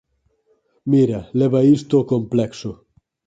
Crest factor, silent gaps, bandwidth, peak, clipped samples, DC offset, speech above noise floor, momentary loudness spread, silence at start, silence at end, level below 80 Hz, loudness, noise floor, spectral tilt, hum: 16 dB; none; 7.8 kHz; -4 dBFS; under 0.1%; under 0.1%; 46 dB; 16 LU; 0.85 s; 0.55 s; -54 dBFS; -18 LUFS; -63 dBFS; -8.5 dB/octave; none